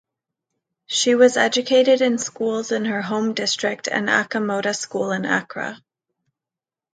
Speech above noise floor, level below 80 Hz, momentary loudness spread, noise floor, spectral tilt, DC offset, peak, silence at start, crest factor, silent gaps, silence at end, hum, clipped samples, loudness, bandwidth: 70 dB; -72 dBFS; 9 LU; -89 dBFS; -3 dB/octave; under 0.1%; -2 dBFS; 0.9 s; 18 dB; none; 1.2 s; none; under 0.1%; -20 LUFS; 9.4 kHz